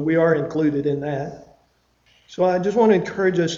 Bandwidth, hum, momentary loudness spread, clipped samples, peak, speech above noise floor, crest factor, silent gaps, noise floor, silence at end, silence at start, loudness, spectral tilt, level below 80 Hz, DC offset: 7.6 kHz; none; 11 LU; under 0.1%; -4 dBFS; 43 dB; 16 dB; none; -62 dBFS; 0 s; 0 s; -20 LUFS; -6.5 dB/octave; -56 dBFS; under 0.1%